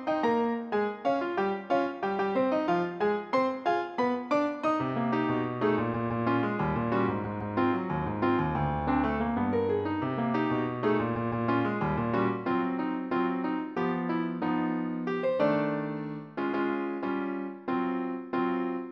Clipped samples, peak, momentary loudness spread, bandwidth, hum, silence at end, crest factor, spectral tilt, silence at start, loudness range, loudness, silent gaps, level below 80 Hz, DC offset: under 0.1%; -14 dBFS; 5 LU; 7 kHz; none; 0 s; 14 dB; -8.5 dB/octave; 0 s; 2 LU; -29 LUFS; none; -54 dBFS; under 0.1%